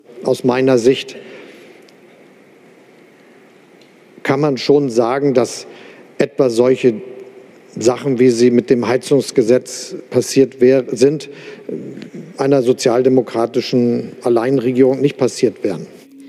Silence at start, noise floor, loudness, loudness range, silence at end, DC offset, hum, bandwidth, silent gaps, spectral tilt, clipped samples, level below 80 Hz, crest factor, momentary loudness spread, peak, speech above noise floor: 0.15 s; -46 dBFS; -15 LUFS; 5 LU; 0 s; under 0.1%; none; 13 kHz; none; -5.5 dB/octave; under 0.1%; -64 dBFS; 16 dB; 17 LU; 0 dBFS; 31 dB